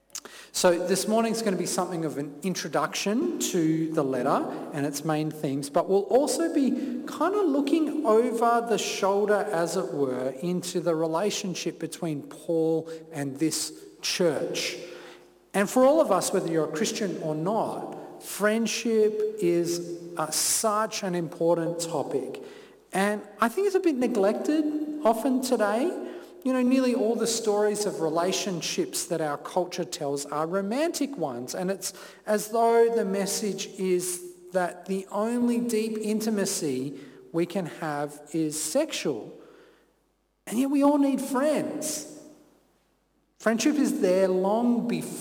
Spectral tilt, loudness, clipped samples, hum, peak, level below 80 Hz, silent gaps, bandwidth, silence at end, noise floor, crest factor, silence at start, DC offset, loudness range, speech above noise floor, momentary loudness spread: -4 dB/octave; -26 LUFS; under 0.1%; none; -12 dBFS; -72 dBFS; none; 19 kHz; 0 s; -70 dBFS; 16 dB; 0.15 s; under 0.1%; 4 LU; 44 dB; 10 LU